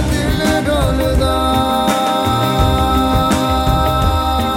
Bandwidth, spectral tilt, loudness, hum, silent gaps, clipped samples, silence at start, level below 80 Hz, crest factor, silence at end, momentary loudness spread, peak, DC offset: 17 kHz; -5.5 dB/octave; -15 LUFS; none; none; under 0.1%; 0 s; -22 dBFS; 12 dB; 0 s; 1 LU; -2 dBFS; under 0.1%